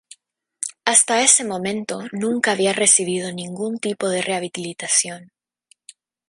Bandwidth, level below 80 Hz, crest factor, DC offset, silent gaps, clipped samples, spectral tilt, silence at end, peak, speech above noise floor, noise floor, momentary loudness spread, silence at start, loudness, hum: 11.5 kHz; -70 dBFS; 22 dB; under 0.1%; none; under 0.1%; -2 dB/octave; 1.05 s; 0 dBFS; 40 dB; -60 dBFS; 15 LU; 0.6 s; -18 LUFS; none